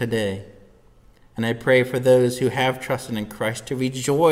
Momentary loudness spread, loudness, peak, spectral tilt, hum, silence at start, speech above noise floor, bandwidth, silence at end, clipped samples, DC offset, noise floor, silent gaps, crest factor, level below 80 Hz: 10 LU; -22 LUFS; -4 dBFS; -5.5 dB/octave; none; 0 s; 31 dB; 16 kHz; 0 s; under 0.1%; under 0.1%; -52 dBFS; none; 18 dB; -54 dBFS